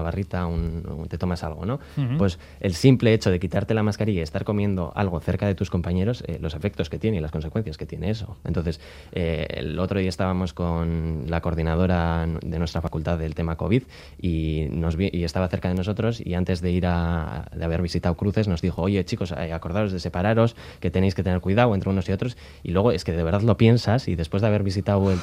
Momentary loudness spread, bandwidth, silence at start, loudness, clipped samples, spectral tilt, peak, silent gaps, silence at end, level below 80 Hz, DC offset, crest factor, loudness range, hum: 9 LU; 12 kHz; 0 s; -24 LUFS; under 0.1%; -7.5 dB/octave; -2 dBFS; none; 0 s; -40 dBFS; under 0.1%; 20 dB; 5 LU; none